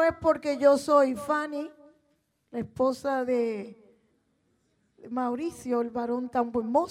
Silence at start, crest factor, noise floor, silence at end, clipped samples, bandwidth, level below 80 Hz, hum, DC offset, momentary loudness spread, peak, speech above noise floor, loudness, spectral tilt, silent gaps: 0 s; 18 dB; -72 dBFS; 0 s; under 0.1%; 15 kHz; -62 dBFS; none; under 0.1%; 14 LU; -10 dBFS; 45 dB; -27 LUFS; -5.5 dB/octave; none